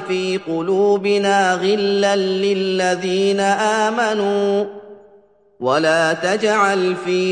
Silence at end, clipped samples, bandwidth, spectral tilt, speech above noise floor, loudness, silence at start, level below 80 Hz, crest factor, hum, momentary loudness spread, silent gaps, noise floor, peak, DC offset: 0 s; under 0.1%; 11 kHz; -4.5 dB/octave; 34 dB; -17 LUFS; 0 s; -66 dBFS; 14 dB; none; 5 LU; none; -51 dBFS; -4 dBFS; under 0.1%